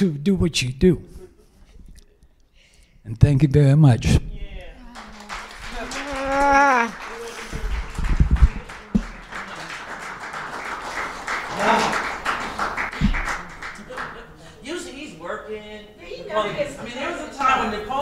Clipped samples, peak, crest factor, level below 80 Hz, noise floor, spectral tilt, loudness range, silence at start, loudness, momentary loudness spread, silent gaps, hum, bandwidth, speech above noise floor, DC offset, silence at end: under 0.1%; 0 dBFS; 22 dB; -30 dBFS; -54 dBFS; -6 dB/octave; 9 LU; 0 s; -22 LUFS; 20 LU; none; none; 13.5 kHz; 37 dB; under 0.1%; 0 s